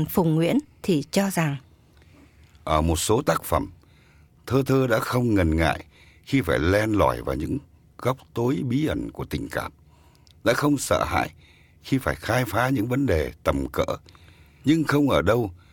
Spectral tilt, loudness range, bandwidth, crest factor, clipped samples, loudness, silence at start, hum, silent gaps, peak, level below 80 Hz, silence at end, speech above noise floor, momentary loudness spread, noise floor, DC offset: -6 dB/octave; 3 LU; 18 kHz; 20 dB; under 0.1%; -24 LUFS; 0 s; none; none; -4 dBFS; -40 dBFS; 0.15 s; 32 dB; 10 LU; -55 dBFS; under 0.1%